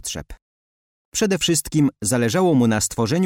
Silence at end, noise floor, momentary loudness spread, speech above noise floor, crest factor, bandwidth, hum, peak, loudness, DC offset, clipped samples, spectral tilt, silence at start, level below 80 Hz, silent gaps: 0 s; under -90 dBFS; 10 LU; over 71 dB; 12 dB; 17 kHz; none; -8 dBFS; -19 LUFS; under 0.1%; under 0.1%; -4.5 dB/octave; 0.05 s; -46 dBFS; 0.42-1.12 s